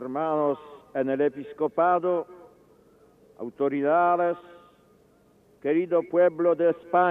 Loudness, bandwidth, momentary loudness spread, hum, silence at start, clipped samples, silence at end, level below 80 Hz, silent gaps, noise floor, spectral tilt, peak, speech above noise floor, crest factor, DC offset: -25 LUFS; 3.9 kHz; 13 LU; none; 0 s; under 0.1%; 0 s; -74 dBFS; none; -60 dBFS; -9 dB/octave; -10 dBFS; 35 dB; 16 dB; under 0.1%